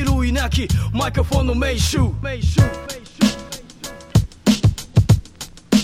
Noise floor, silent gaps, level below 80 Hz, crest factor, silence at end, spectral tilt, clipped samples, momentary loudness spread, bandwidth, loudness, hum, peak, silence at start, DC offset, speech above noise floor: -37 dBFS; none; -26 dBFS; 16 dB; 0 s; -5.5 dB/octave; under 0.1%; 15 LU; 16 kHz; -19 LUFS; none; -2 dBFS; 0 s; under 0.1%; 19 dB